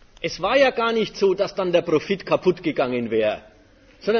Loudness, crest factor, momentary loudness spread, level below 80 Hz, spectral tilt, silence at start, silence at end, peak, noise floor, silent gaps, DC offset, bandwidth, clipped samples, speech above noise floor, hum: -21 LUFS; 16 dB; 8 LU; -54 dBFS; -5.5 dB/octave; 0.2 s; 0 s; -4 dBFS; -52 dBFS; none; under 0.1%; 6.8 kHz; under 0.1%; 31 dB; none